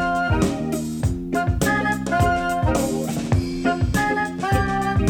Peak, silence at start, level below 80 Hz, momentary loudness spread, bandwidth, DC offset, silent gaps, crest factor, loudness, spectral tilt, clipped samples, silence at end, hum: -4 dBFS; 0 s; -32 dBFS; 4 LU; 18 kHz; under 0.1%; none; 16 dB; -22 LUFS; -6 dB/octave; under 0.1%; 0 s; none